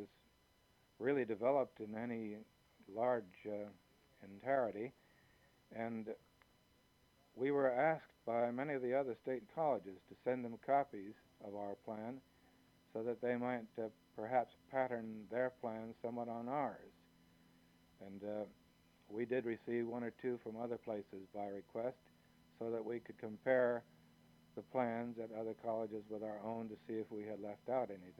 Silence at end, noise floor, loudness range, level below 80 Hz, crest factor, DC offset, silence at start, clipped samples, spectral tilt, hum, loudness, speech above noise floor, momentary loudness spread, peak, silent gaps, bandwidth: 0.05 s; -73 dBFS; 6 LU; -82 dBFS; 20 dB; under 0.1%; 0 s; under 0.1%; -8 dB/octave; none; -42 LUFS; 32 dB; 14 LU; -22 dBFS; none; 15.5 kHz